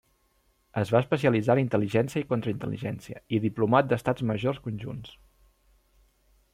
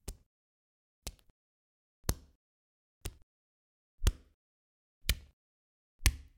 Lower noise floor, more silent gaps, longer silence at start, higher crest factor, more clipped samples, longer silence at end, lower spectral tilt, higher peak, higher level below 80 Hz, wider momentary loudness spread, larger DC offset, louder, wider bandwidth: second, -68 dBFS vs under -90 dBFS; second, none vs 0.26-1.02 s, 1.30-2.03 s, 2.35-3.01 s, 3.23-3.98 s, 4.34-5.01 s, 5.33-5.99 s; first, 0.75 s vs 0.05 s; second, 20 dB vs 34 dB; neither; first, 1.45 s vs 0.2 s; first, -7.5 dB/octave vs -3 dB/octave; about the same, -8 dBFS vs -8 dBFS; second, -60 dBFS vs -42 dBFS; second, 13 LU vs 16 LU; neither; first, -27 LUFS vs -39 LUFS; about the same, 15 kHz vs 16.5 kHz